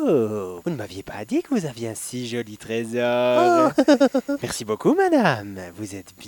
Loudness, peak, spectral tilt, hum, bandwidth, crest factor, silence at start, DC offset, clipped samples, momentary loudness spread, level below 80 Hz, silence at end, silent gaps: -22 LUFS; -4 dBFS; -5.5 dB/octave; none; 19 kHz; 18 dB; 0 s; under 0.1%; under 0.1%; 17 LU; -60 dBFS; 0 s; none